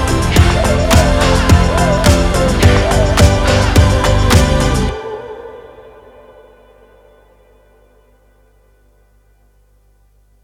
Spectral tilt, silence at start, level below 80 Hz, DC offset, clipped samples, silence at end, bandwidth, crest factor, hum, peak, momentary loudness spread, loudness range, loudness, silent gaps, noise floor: -5 dB/octave; 0 s; -20 dBFS; under 0.1%; 0.4%; 4.85 s; 16.5 kHz; 14 dB; 50 Hz at -30 dBFS; 0 dBFS; 13 LU; 11 LU; -12 LUFS; none; -51 dBFS